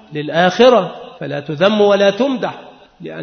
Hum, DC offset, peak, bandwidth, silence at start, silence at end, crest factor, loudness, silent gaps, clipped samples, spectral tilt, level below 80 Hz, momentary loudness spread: none; under 0.1%; 0 dBFS; 6.6 kHz; 0.1 s; 0 s; 14 dB; -14 LUFS; none; under 0.1%; -5.5 dB/octave; -58 dBFS; 17 LU